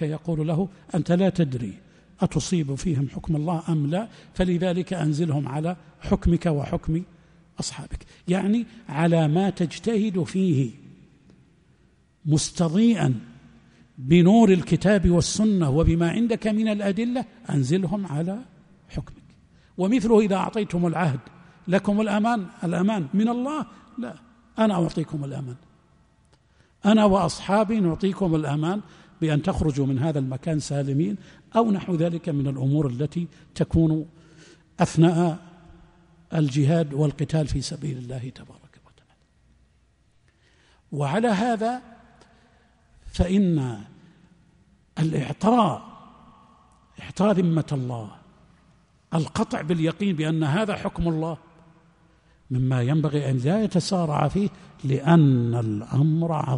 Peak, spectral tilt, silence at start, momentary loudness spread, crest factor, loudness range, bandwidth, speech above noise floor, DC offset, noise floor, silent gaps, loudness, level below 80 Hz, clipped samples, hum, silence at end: -6 dBFS; -7 dB/octave; 0 s; 15 LU; 18 dB; 7 LU; 10.5 kHz; 39 dB; under 0.1%; -62 dBFS; none; -23 LUFS; -42 dBFS; under 0.1%; none; 0 s